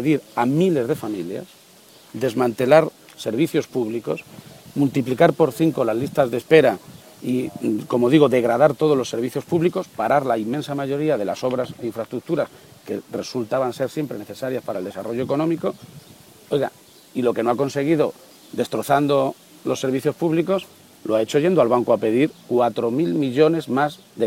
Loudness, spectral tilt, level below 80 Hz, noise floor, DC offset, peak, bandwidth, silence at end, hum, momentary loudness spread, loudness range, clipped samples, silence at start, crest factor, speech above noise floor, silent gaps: -21 LUFS; -6.5 dB/octave; -64 dBFS; -49 dBFS; under 0.1%; 0 dBFS; 16.5 kHz; 0 s; none; 12 LU; 7 LU; under 0.1%; 0 s; 20 dB; 29 dB; none